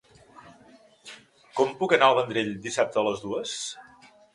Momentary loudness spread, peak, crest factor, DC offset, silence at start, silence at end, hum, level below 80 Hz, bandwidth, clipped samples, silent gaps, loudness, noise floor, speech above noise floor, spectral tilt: 25 LU; -4 dBFS; 24 dB; under 0.1%; 0.45 s; 0.55 s; none; -68 dBFS; 11.5 kHz; under 0.1%; none; -25 LUFS; -55 dBFS; 30 dB; -3.5 dB/octave